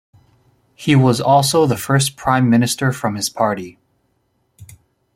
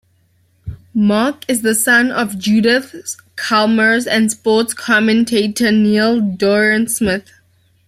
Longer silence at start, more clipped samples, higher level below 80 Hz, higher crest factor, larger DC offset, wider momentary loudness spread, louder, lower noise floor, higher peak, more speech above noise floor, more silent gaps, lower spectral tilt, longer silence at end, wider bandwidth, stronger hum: first, 0.8 s vs 0.65 s; neither; about the same, -52 dBFS vs -48 dBFS; about the same, 16 dB vs 12 dB; neither; second, 8 LU vs 11 LU; about the same, -16 LUFS vs -14 LUFS; first, -65 dBFS vs -57 dBFS; about the same, -2 dBFS vs -2 dBFS; first, 50 dB vs 43 dB; neither; about the same, -5 dB/octave vs -4 dB/octave; second, 0.5 s vs 0.65 s; about the same, 16.5 kHz vs 15.5 kHz; neither